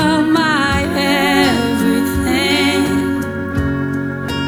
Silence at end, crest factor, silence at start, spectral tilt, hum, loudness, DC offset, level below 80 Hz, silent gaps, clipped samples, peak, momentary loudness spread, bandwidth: 0 s; 14 dB; 0 s; -5 dB/octave; none; -15 LUFS; under 0.1%; -36 dBFS; none; under 0.1%; 0 dBFS; 7 LU; over 20 kHz